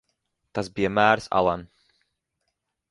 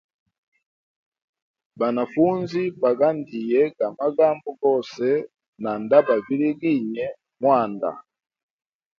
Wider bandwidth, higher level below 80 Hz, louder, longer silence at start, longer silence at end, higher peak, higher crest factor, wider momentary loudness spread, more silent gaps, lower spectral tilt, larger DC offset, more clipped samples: first, 11.5 kHz vs 7 kHz; first, -54 dBFS vs -70 dBFS; about the same, -24 LUFS vs -22 LUFS; second, 0.55 s vs 1.75 s; first, 1.25 s vs 0.95 s; about the same, -4 dBFS vs -2 dBFS; about the same, 24 dB vs 20 dB; first, 14 LU vs 11 LU; second, none vs 5.48-5.53 s; second, -5.5 dB/octave vs -8 dB/octave; neither; neither